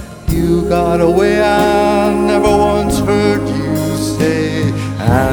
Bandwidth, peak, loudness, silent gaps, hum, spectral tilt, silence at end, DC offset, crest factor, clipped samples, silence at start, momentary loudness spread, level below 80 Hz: over 20 kHz; 0 dBFS; -13 LUFS; none; none; -6 dB/octave; 0 s; under 0.1%; 12 dB; under 0.1%; 0 s; 6 LU; -28 dBFS